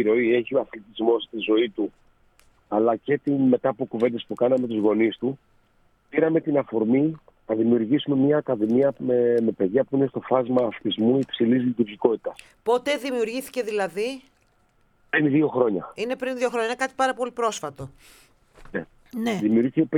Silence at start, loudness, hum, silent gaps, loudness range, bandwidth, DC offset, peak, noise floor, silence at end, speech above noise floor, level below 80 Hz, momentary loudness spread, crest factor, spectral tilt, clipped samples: 0 s; -23 LUFS; none; none; 5 LU; 15.5 kHz; under 0.1%; -4 dBFS; -63 dBFS; 0 s; 40 dB; -62 dBFS; 10 LU; 18 dB; -6 dB/octave; under 0.1%